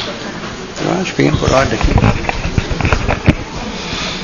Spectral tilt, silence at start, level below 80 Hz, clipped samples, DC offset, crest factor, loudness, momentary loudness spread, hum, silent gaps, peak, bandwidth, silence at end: -5.5 dB/octave; 0 s; -22 dBFS; 0.2%; 0.4%; 16 dB; -16 LUFS; 11 LU; none; none; 0 dBFS; 7.4 kHz; 0 s